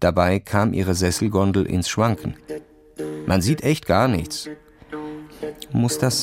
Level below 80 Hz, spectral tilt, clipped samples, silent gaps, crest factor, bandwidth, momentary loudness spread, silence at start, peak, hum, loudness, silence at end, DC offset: -42 dBFS; -5.5 dB/octave; under 0.1%; none; 18 dB; 16.5 kHz; 16 LU; 0 s; -2 dBFS; none; -21 LUFS; 0 s; under 0.1%